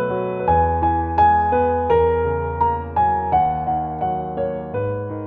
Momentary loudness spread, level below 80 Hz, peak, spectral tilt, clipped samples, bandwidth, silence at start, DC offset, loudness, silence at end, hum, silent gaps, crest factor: 8 LU; -34 dBFS; -6 dBFS; -10.5 dB/octave; under 0.1%; 4.5 kHz; 0 s; under 0.1%; -19 LUFS; 0 s; none; none; 14 dB